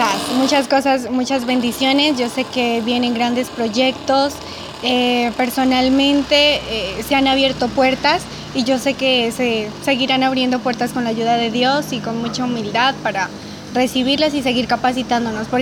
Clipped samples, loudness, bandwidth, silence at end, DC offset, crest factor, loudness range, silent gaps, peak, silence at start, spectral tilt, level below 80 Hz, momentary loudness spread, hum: under 0.1%; -17 LUFS; 19 kHz; 0 s; under 0.1%; 16 dB; 3 LU; none; -2 dBFS; 0 s; -3.5 dB/octave; -46 dBFS; 7 LU; none